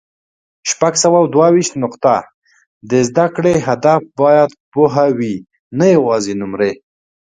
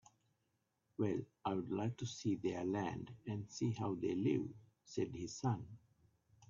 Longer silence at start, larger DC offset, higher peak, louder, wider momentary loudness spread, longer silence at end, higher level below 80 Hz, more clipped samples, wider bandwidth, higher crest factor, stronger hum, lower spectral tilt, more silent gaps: second, 0.65 s vs 1 s; neither; first, 0 dBFS vs -24 dBFS; first, -14 LUFS vs -41 LUFS; about the same, 9 LU vs 10 LU; first, 0.6 s vs 0.05 s; first, -54 dBFS vs -74 dBFS; neither; first, 9.6 kHz vs 7.6 kHz; about the same, 14 dB vs 18 dB; neither; second, -5 dB/octave vs -7 dB/octave; first, 2.34-2.42 s, 2.67-2.81 s, 4.60-4.72 s, 5.60-5.71 s vs none